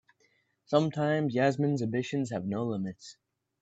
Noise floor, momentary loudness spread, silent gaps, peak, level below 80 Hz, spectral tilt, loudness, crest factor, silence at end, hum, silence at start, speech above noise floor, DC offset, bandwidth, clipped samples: -71 dBFS; 10 LU; none; -10 dBFS; -74 dBFS; -7 dB/octave; -30 LUFS; 20 dB; 0.5 s; none; 0.7 s; 42 dB; under 0.1%; 8.2 kHz; under 0.1%